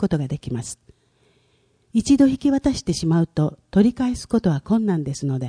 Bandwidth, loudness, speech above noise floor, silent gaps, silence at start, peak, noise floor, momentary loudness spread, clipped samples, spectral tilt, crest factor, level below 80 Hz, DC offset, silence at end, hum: 10.5 kHz; -21 LUFS; 42 dB; none; 0 s; -6 dBFS; -62 dBFS; 11 LU; under 0.1%; -6.5 dB/octave; 16 dB; -44 dBFS; under 0.1%; 0 s; none